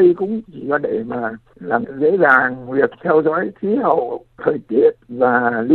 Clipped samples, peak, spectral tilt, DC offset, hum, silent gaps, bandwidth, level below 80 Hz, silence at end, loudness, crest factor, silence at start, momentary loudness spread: under 0.1%; 0 dBFS; -9.5 dB/octave; under 0.1%; none; none; 4.3 kHz; -58 dBFS; 0 s; -18 LUFS; 16 dB; 0 s; 10 LU